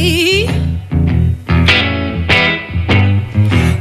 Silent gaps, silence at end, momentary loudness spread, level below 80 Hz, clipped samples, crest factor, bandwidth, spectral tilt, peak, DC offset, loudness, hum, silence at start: none; 0 s; 7 LU; -24 dBFS; under 0.1%; 12 dB; 14 kHz; -5.5 dB/octave; 0 dBFS; under 0.1%; -12 LUFS; none; 0 s